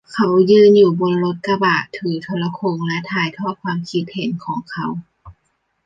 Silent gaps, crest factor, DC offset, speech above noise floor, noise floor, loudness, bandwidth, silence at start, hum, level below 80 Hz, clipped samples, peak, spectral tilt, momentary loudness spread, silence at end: none; 16 dB; under 0.1%; 51 dB; -68 dBFS; -17 LUFS; 7.6 kHz; 0.1 s; none; -58 dBFS; under 0.1%; -2 dBFS; -7 dB/octave; 15 LU; 0.55 s